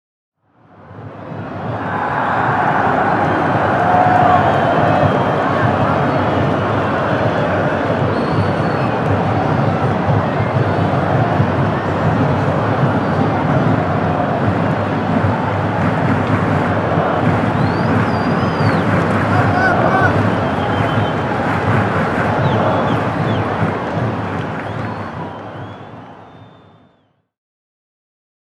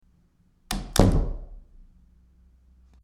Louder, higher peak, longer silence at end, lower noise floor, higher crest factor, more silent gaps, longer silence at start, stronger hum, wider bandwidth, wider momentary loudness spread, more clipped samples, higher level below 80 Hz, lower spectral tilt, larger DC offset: first, -16 LUFS vs -25 LUFS; about the same, 0 dBFS vs -2 dBFS; first, 1.95 s vs 1.45 s; second, -58 dBFS vs -62 dBFS; second, 16 dB vs 26 dB; neither; about the same, 0.8 s vs 0.7 s; neither; second, 10.5 kHz vs 15.5 kHz; second, 9 LU vs 21 LU; neither; second, -42 dBFS vs -32 dBFS; first, -8 dB/octave vs -5.5 dB/octave; first, 0.1% vs under 0.1%